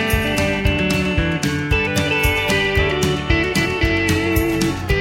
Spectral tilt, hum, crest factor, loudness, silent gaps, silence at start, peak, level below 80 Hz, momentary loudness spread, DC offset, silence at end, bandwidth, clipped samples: -5 dB/octave; none; 16 dB; -18 LUFS; none; 0 s; -2 dBFS; -28 dBFS; 3 LU; under 0.1%; 0 s; 16.5 kHz; under 0.1%